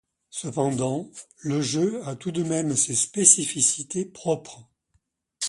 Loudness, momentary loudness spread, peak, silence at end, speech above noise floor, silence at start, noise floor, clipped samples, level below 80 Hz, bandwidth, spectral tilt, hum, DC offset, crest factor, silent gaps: -23 LUFS; 16 LU; -2 dBFS; 0 s; 46 dB; 0.35 s; -71 dBFS; under 0.1%; -66 dBFS; 11.5 kHz; -3.5 dB/octave; none; under 0.1%; 24 dB; none